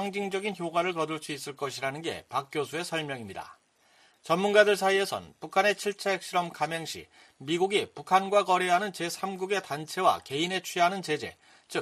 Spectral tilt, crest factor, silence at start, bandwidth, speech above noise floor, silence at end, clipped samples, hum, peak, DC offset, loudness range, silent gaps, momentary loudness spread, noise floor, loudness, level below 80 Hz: -3.5 dB/octave; 24 dB; 0 s; 14.5 kHz; 34 dB; 0 s; under 0.1%; none; -6 dBFS; under 0.1%; 6 LU; none; 13 LU; -63 dBFS; -28 LUFS; -72 dBFS